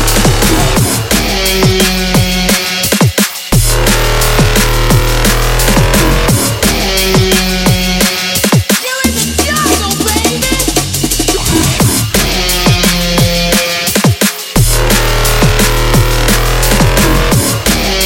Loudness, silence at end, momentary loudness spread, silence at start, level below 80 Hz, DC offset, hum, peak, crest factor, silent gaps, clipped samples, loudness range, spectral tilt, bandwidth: -10 LUFS; 0 s; 2 LU; 0 s; -16 dBFS; under 0.1%; none; 0 dBFS; 10 dB; none; under 0.1%; 1 LU; -3.5 dB/octave; 17.5 kHz